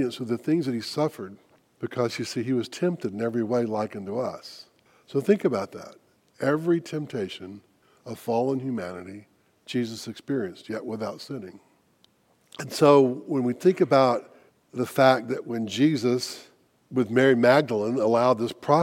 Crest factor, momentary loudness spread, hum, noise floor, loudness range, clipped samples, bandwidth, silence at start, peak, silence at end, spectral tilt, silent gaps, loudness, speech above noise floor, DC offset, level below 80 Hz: 20 dB; 18 LU; none; -64 dBFS; 9 LU; under 0.1%; 16.5 kHz; 0 s; -4 dBFS; 0 s; -6 dB/octave; none; -25 LUFS; 39 dB; under 0.1%; -74 dBFS